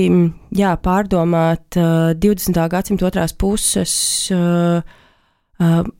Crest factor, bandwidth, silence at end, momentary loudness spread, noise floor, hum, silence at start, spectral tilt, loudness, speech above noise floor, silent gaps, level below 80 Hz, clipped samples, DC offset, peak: 12 dB; 17 kHz; 0.1 s; 3 LU; -57 dBFS; none; 0 s; -5 dB/octave; -16 LUFS; 41 dB; none; -34 dBFS; under 0.1%; under 0.1%; -4 dBFS